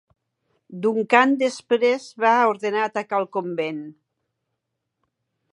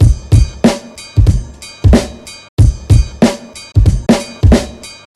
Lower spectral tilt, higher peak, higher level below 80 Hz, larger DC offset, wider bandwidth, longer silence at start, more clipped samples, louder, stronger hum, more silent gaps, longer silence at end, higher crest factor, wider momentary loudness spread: second, -4.5 dB/octave vs -6.5 dB/octave; about the same, -2 dBFS vs 0 dBFS; second, -80 dBFS vs -16 dBFS; neither; second, 11 kHz vs 13 kHz; first, 0.7 s vs 0 s; neither; second, -21 LUFS vs -12 LUFS; neither; second, none vs 2.49-2.57 s; first, 1.6 s vs 0.25 s; first, 22 dB vs 12 dB; second, 11 LU vs 16 LU